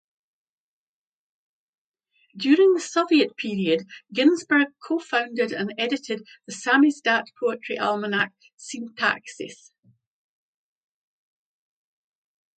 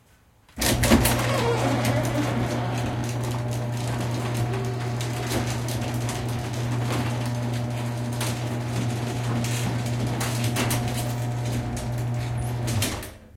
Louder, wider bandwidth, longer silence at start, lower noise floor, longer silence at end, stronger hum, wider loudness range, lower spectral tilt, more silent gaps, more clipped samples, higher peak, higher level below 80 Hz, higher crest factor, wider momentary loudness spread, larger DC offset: first, -23 LUFS vs -26 LUFS; second, 9.2 kHz vs 17 kHz; first, 2.35 s vs 0.55 s; first, under -90 dBFS vs -57 dBFS; first, 3.05 s vs 0.05 s; neither; first, 9 LU vs 4 LU; about the same, -4 dB/octave vs -5 dB/octave; first, 8.54-8.58 s vs none; neither; about the same, -6 dBFS vs -4 dBFS; second, -78 dBFS vs -40 dBFS; about the same, 20 dB vs 22 dB; first, 16 LU vs 5 LU; neither